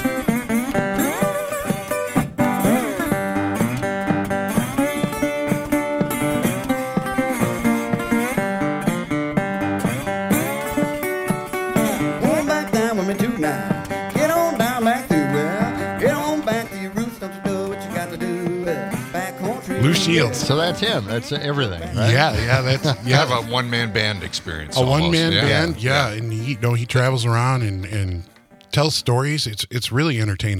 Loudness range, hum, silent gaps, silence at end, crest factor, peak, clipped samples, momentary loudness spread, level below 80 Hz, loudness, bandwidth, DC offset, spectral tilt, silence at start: 3 LU; none; none; 0 s; 20 dB; 0 dBFS; under 0.1%; 7 LU; -46 dBFS; -21 LUFS; 16.5 kHz; under 0.1%; -5 dB/octave; 0 s